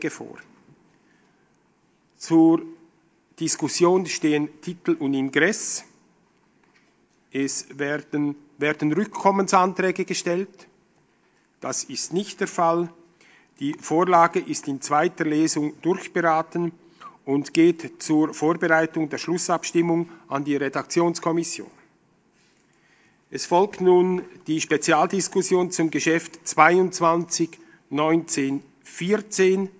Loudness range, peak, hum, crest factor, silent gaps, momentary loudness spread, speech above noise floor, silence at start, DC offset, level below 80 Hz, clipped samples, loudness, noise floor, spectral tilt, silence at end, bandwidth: 6 LU; 0 dBFS; none; 22 dB; none; 12 LU; 41 dB; 0 s; under 0.1%; -74 dBFS; under 0.1%; -23 LUFS; -63 dBFS; -4.5 dB/octave; 0.1 s; 8 kHz